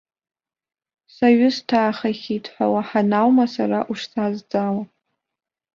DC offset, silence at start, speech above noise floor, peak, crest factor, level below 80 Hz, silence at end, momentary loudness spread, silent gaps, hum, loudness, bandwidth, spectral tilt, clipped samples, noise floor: under 0.1%; 1.2 s; 67 dB; -4 dBFS; 18 dB; -66 dBFS; 0.9 s; 10 LU; none; none; -20 LUFS; 7.2 kHz; -6.5 dB/octave; under 0.1%; -86 dBFS